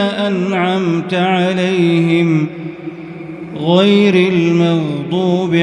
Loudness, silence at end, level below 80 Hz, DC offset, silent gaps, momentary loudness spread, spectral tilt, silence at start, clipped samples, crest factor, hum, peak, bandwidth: -14 LUFS; 0 s; -58 dBFS; under 0.1%; none; 17 LU; -7 dB/octave; 0 s; under 0.1%; 14 dB; none; 0 dBFS; 10 kHz